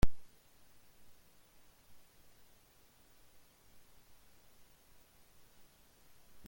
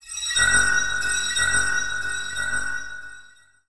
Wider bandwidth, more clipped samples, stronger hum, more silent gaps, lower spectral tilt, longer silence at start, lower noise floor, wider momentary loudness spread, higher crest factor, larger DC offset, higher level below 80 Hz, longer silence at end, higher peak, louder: first, 17 kHz vs 11 kHz; neither; neither; neither; first, -6 dB/octave vs 0.5 dB/octave; about the same, 0.05 s vs 0 s; first, -66 dBFS vs -51 dBFS; second, 1 LU vs 14 LU; first, 24 dB vs 18 dB; second, under 0.1% vs 2%; about the same, -50 dBFS vs -46 dBFS; first, 6.25 s vs 0 s; second, -14 dBFS vs -6 dBFS; second, -58 LUFS vs -21 LUFS